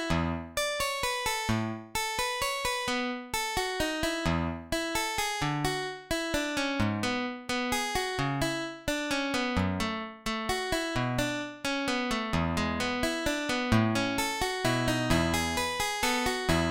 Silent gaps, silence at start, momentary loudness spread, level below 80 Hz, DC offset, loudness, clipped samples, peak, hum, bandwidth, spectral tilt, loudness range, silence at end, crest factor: none; 0 s; 5 LU; -46 dBFS; under 0.1%; -30 LUFS; under 0.1%; -12 dBFS; none; 17 kHz; -4 dB/octave; 2 LU; 0 s; 20 dB